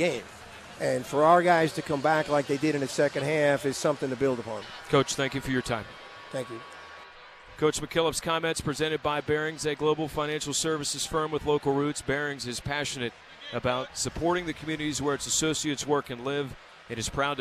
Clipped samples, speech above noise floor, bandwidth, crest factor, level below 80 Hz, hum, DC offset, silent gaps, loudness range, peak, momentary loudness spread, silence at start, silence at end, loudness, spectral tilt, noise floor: under 0.1%; 21 dB; 14 kHz; 20 dB; -54 dBFS; none; under 0.1%; none; 6 LU; -8 dBFS; 14 LU; 0 s; 0 s; -28 LUFS; -4 dB/octave; -49 dBFS